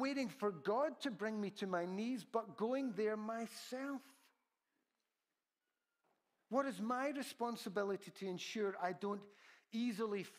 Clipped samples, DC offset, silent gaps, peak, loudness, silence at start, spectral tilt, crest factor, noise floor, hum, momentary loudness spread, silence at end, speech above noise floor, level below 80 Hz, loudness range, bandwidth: under 0.1%; under 0.1%; none; -24 dBFS; -42 LUFS; 0 s; -5 dB/octave; 20 dB; under -90 dBFS; none; 7 LU; 0 s; over 48 dB; under -90 dBFS; 7 LU; 15.5 kHz